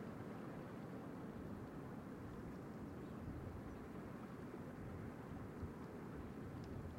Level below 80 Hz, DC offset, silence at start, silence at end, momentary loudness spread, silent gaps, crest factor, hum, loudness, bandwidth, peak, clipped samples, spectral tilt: -64 dBFS; under 0.1%; 0 s; 0 s; 1 LU; none; 14 dB; none; -52 LUFS; 16 kHz; -38 dBFS; under 0.1%; -8 dB/octave